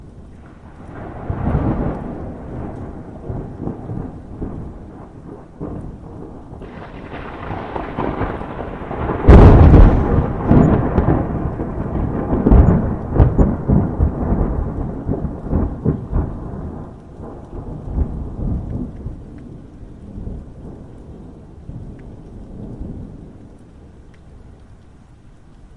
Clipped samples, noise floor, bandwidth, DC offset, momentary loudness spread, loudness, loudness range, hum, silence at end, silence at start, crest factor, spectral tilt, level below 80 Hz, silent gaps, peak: under 0.1%; -43 dBFS; 4.8 kHz; under 0.1%; 24 LU; -17 LUFS; 23 LU; none; 0.1 s; 0 s; 18 dB; -10.5 dB/octave; -22 dBFS; none; 0 dBFS